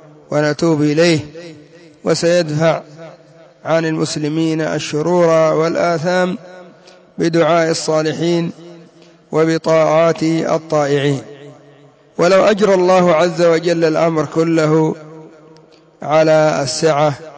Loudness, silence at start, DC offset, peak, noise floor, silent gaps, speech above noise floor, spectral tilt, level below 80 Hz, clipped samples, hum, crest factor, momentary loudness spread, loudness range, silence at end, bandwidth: -15 LUFS; 0.3 s; under 0.1%; -2 dBFS; -46 dBFS; none; 32 dB; -5.5 dB/octave; -58 dBFS; under 0.1%; none; 14 dB; 9 LU; 4 LU; 0 s; 8 kHz